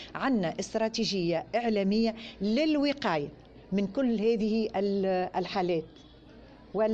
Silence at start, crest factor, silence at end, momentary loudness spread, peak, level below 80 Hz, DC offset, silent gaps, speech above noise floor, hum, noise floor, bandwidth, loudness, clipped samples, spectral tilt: 0 s; 12 dB; 0 s; 6 LU; -16 dBFS; -58 dBFS; under 0.1%; none; 23 dB; none; -52 dBFS; 8.6 kHz; -29 LUFS; under 0.1%; -6 dB/octave